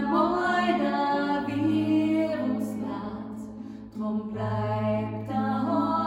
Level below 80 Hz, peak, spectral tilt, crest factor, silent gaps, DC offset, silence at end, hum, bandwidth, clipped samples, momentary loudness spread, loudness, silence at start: -58 dBFS; -12 dBFS; -7.5 dB/octave; 16 dB; none; under 0.1%; 0 s; none; 15.5 kHz; under 0.1%; 12 LU; -27 LUFS; 0 s